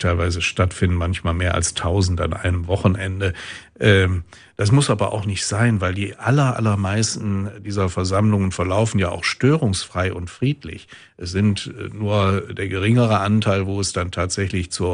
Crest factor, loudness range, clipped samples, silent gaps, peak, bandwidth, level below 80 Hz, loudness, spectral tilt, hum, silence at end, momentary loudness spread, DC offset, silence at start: 18 dB; 2 LU; under 0.1%; none; -2 dBFS; 10.5 kHz; -38 dBFS; -20 LUFS; -5.5 dB/octave; none; 0 s; 8 LU; under 0.1%; 0 s